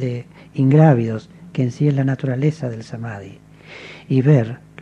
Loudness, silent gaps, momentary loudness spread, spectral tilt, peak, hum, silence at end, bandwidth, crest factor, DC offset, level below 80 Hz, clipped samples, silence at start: -18 LUFS; none; 18 LU; -9 dB/octave; 0 dBFS; none; 0 s; 7.4 kHz; 18 dB; under 0.1%; -58 dBFS; under 0.1%; 0 s